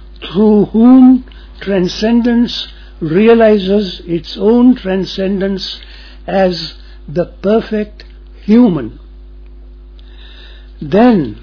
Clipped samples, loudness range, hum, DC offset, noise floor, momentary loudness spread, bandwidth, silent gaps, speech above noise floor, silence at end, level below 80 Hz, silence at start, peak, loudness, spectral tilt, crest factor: under 0.1%; 7 LU; none; under 0.1%; -33 dBFS; 17 LU; 5.4 kHz; none; 23 dB; 0.05 s; -34 dBFS; 0 s; 0 dBFS; -11 LUFS; -7.5 dB/octave; 12 dB